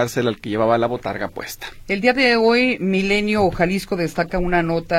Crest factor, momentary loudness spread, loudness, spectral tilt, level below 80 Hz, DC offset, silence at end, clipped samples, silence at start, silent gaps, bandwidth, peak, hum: 18 dB; 12 LU; -19 LUFS; -5.5 dB/octave; -38 dBFS; under 0.1%; 0 s; under 0.1%; 0 s; none; 16.5 kHz; -2 dBFS; none